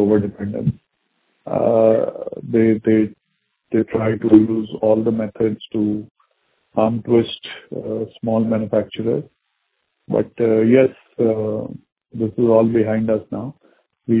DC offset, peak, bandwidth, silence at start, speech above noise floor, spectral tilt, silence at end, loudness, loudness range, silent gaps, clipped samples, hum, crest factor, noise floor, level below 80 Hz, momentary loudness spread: under 0.1%; 0 dBFS; 4 kHz; 0 s; 54 dB; -12 dB/octave; 0 s; -19 LUFS; 4 LU; 6.11-6.15 s, 11.92-11.96 s; under 0.1%; none; 18 dB; -71 dBFS; -52 dBFS; 14 LU